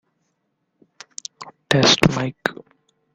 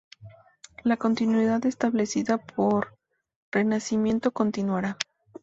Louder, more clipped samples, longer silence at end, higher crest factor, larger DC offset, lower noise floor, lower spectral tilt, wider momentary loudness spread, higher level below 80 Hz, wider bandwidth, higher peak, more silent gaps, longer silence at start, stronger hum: first, -18 LUFS vs -26 LUFS; neither; first, 0.65 s vs 0.4 s; about the same, 22 dB vs 24 dB; neither; first, -72 dBFS vs -52 dBFS; second, -4 dB/octave vs -5.5 dB/octave; first, 21 LU vs 7 LU; first, -52 dBFS vs -62 dBFS; first, 14 kHz vs 8 kHz; first, 0 dBFS vs -4 dBFS; second, none vs 3.36-3.52 s; first, 1.4 s vs 0.2 s; neither